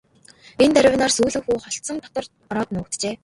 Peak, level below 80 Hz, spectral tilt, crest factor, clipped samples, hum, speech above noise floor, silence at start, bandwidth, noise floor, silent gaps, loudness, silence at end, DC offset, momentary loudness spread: -2 dBFS; -50 dBFS; -3.5 dB/octave; 20 dB; under 0.1%; none; 30 dB; 0.6 s; 11.5 kHz; -50 dBFS; none; -20 LUFS; 0.1 s; under 0.1%; 14 LU